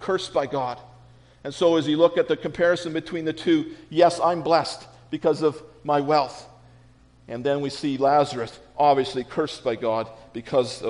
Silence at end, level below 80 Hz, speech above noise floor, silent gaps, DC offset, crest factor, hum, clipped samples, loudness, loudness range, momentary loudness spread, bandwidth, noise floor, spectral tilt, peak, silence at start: 0 s; -58 dBFS; 31 dB; none; under 0.1%; 20 dB; none; under 0.1%; -23 LUFS; 3 LU; 14 LU; 10.5 kHz; -53 dBFS; -5.5 dB/octave; -4 dBFS; 0 s